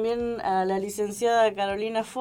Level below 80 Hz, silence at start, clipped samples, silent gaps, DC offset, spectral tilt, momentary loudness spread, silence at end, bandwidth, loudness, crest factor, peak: -56 dBFS; 0 s; under 0.1%; none; under 0.1%; -4 dB/octave; 6 LU; 0 s; 18 kHz; -26 LUFS; 14 dB; -12 dBFS